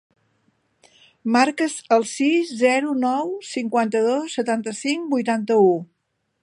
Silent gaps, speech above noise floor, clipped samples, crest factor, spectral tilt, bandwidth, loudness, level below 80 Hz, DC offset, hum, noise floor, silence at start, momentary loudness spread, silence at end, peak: none; 53 dB; under 0.1%; 18 dB; -4.5 dB/octave; 11.5 kHz; -21 LUFS; -78 dBFS; under 0.1%; none; -73 dBFS; 1.25 s; 8 LU; 0.6 s; -2 dBFS